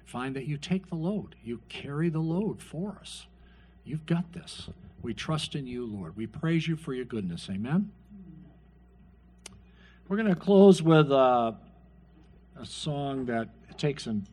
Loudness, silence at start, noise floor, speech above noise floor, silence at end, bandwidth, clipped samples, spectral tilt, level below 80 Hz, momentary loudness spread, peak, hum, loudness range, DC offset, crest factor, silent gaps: -28 LUFS; 0.1 s; -56 dBFS; 28 dB; 0.05 s; 11.5 kHz; under 0.1%; -7 dB/octave; -58 dBFS; 21 LU; -6 dBFS; 60 Hz at -55 dBFS; 11 LU; under 0.1%; 22 dB; none